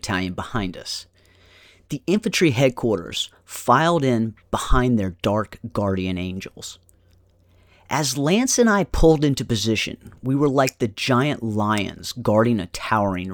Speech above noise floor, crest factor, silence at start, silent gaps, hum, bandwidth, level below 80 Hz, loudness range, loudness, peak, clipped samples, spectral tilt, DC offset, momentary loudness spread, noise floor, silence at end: 36 dB; 20 dB; 0.05 s; none; none; 19 kHz; -34 dBFS; 5 LU; -21 LUFS; -2 dBFS; under 0.1%; -5 dB/octave; under 0.1%; 12 LU; -56 dBFS; 0 s